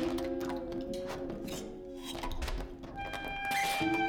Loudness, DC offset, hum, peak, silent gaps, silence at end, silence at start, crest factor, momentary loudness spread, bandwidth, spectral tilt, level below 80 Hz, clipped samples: -37 LUFS; under 0.1%; none; -22 dBFS; none; 0 s; 0 s; 14 dB; 12 LU; 19 kHz; -4 dB/octave; -46 dBFS; under 0.1%